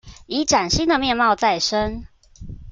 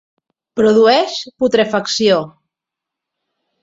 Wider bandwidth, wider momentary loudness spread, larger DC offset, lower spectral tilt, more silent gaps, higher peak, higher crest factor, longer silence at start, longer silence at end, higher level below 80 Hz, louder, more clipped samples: first, 10 kHz vs 7.8 kHz; first, 18 LU vs 11 LU; neither; about the same, -3 dB/octave vs -4 dB/octave; neither; second, -4 dBFS vs 0 dBFS; about the same, 16 dB vs 16 dB; second, 0.05 s vs 0.55 s; second, 0 s vs 1.35 s; first, -38 dBFS vs -56 dBFS; second, -19 LUFS vs -14 LUFS; neither